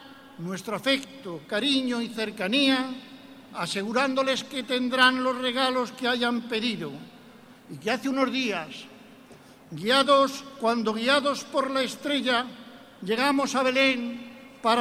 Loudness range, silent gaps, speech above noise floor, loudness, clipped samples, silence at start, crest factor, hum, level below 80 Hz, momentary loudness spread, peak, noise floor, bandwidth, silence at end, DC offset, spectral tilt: 4 LU; none; 25 dB; -25 LUFS; under 0.1%; 0 s; 22 dB; none; -70 dBFS; 18 LU; -6 dBFS; -50 dBFS; 15.5 kHz; 0 s; under 0.1%; -3.5 dB/octave